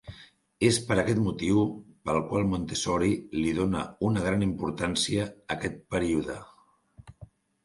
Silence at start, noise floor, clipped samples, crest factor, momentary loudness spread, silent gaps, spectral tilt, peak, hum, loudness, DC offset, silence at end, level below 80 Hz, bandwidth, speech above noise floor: 0.05 s; -57 dBFS; under 0.1%; 20 dB; 8 LU; none; -5 dB/octave; -8 dBFS; none; -28 LUFS; under 0.1%; 0.4 s; -50 dBFS; 11.5 kHz; 30 dB